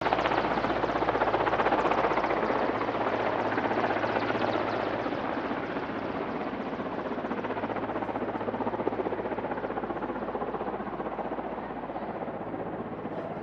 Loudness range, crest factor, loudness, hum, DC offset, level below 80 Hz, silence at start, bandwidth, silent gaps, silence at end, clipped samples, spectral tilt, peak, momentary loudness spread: 7 LU; 22 dB; -30 LUFS; none; under 0.1%; -54 dBFS; 0 s; 7.8 kHz; none; 0 s; under 0.1%; -7 dB/octave; -8 dBFS; 9 LU